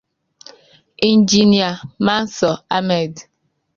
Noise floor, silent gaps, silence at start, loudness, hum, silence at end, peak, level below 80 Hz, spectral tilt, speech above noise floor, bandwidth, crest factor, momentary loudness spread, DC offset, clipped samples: -48 dBFS; none; 1 s; -16 LUFS; none; 0.55 s; -2 dBFS; -54 dBFS; -4.5 dB/octave; 32 dB; 7.4 kHz; 16 dB; 8 LU; under 0.1%; under 0.1%